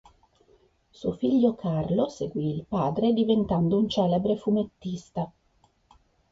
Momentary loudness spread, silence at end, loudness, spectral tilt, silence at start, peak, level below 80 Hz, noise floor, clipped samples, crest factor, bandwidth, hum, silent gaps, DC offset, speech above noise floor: 11 LU; 1.05 s; -26 LUFS; -8.5 dB/octave; 1 s; -10 dBFS; -56 dBFS; -66 dBFS; under 0.1%; 16 dB; 7.8 kHz; none; none; under 0.1%; 40 dB